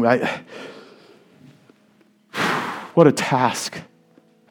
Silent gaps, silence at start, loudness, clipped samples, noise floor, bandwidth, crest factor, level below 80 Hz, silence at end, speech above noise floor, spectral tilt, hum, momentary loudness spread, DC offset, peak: none; 0 s; -20 LUFS; under 0.1%; -57 dBFS; 18 kHz; 22 dB; -68 dBFS; 0.65 s; 39 dB; -5 dB/octave; none; 22 LU; under 0.1%; 0 dBFS